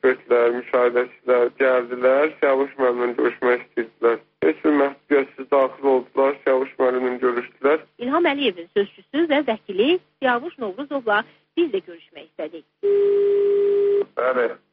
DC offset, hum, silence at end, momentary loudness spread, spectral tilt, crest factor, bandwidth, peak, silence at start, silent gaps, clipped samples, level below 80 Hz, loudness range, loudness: under 0.1%; none; 0.15 s; 7 LU; -2 dB/octave; 14 dB; 5 kHz; -6 dBFS; 0.05 s; none; under 0.1%; -70 dBFS; 3 LU; -21 LUFS